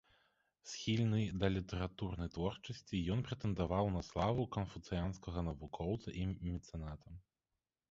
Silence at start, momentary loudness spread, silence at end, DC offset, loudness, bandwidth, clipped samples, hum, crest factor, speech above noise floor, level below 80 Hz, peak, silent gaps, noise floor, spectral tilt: 0.65 s; 12 LU; 0.7 s; under 0.1%; -40 LUFS; 7.6 kHz; under 0.1%; none; 20 dB; over 51 dB; -52 dBFS; -20 dBFS; none; under -90 dBFS; -6.5 dB/octave